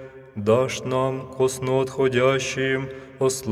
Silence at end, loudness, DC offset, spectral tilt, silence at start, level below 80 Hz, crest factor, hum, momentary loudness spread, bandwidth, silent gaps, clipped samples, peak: 0 s; -23 LUFS; under 0.1%; -5 dB/octave; 0 s; -56 dBFS; 16 dB; none; 7 LU; 15 kHz; none; under 0.1%; -6 dBFS